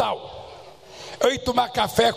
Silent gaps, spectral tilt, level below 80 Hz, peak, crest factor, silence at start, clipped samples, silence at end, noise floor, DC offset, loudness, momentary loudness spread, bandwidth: none; -3.5 dB/octave; -50 dBFS; -4 dBFS; 20 dB; 0 s; under 0.1%; 0 s; -43 dBFS; 0.1%; -23 LUFS; 22 LU; 15 kHz